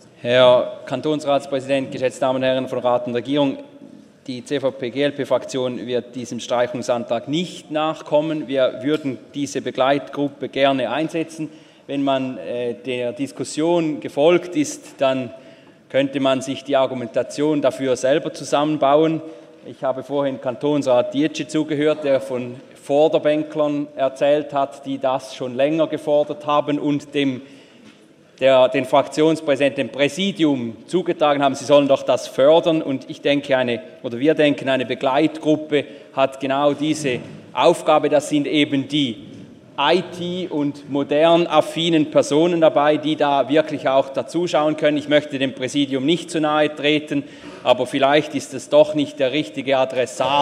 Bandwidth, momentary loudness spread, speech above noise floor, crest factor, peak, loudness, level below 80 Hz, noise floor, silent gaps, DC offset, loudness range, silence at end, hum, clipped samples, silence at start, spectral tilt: 13 kHz; 10 LU; 30 dB; 18 dB; 0 dBFS; -20 LUFS; -70 dBFS; -49 dBFS; none; under 0.1%; 5 LU; 0 s; none; under 0.1%; 0.25 s; -5 dB/octave